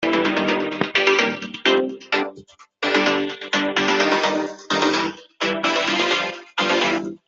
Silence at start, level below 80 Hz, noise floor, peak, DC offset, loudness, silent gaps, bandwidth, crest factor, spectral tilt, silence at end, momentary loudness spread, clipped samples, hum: 0 s; -66 dBFS; -46 dBFS; -4 dBFS; under 0.1%; -20 LUFS; none; 7.8 kHz; 18 dB; -3 dB/octave; 0.1 s; 6 LU; under 0.1%; none